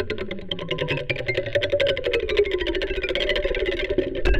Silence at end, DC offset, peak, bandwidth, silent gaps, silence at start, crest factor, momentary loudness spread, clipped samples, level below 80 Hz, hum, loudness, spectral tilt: 0 s; under 0.1%; -6 dBFS; 11.5 kHz; none; 0 s; 18 dB; 7 LU; under 0.1%; -32 dBFS; none; -24 LUFS; -5.5 dB/octave